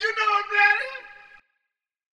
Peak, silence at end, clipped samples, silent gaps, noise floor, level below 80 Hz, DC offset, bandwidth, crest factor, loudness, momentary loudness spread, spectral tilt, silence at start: -6 dBFS; 1 s; under 0.1%; none; -82 dBFS; -70 dBFS; under 0.1%; 10.5 kHz; 18 dB; -20 LUFS; 15 LU; 1 dB/octave; 0 s